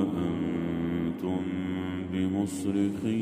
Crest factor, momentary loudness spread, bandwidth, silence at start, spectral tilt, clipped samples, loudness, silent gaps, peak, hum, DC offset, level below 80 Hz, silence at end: 14 dB; 4 LU; 15 kHz; 0 s; -7 dB/octave; under 0.1%; -30 LUFS; none; -14 dBFS; none; under 0.1%; -56 dBFS; 0 s